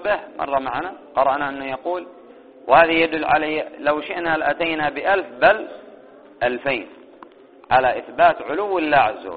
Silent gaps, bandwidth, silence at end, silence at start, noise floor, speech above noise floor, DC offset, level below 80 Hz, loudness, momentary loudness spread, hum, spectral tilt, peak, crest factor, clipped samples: none; 4.7 kHz; 0 s; 0 s; -45 dBFS; 26 dB; 0.2%; -54 dBFS; -20 LUFS; 10 LU; none; -1.5 dB/octave; 0 dBFS; 20 dB; under 0.1%